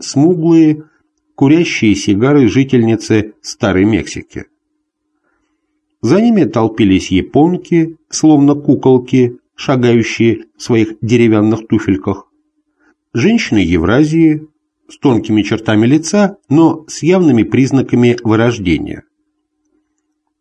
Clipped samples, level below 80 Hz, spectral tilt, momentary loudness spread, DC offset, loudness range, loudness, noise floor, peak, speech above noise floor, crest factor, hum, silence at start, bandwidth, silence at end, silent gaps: under 0.1%; -38 dBFS; -6.5 dB/octave; 8 LU; under 0.1%; 4 LU; -12 LUFS; -68 dBFS; 0 dBFS; 57 dB; 12 dB; none; 0 s; 9.6 kHz; 1.4 s; none